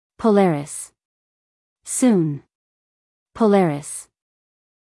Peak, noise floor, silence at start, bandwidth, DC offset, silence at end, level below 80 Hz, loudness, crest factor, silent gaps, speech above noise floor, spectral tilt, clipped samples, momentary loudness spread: -6 dBFS; under -90 dBFS; 0.2 s; 12 kHz; under 0.1%; 0.9 s; -62 dBFS; -19 LUFS; 16 dB; 1.05-1.76 s, 2.55-3.26 s; over 72 dB; -6 dB/octave; under 0.1%; 17 LU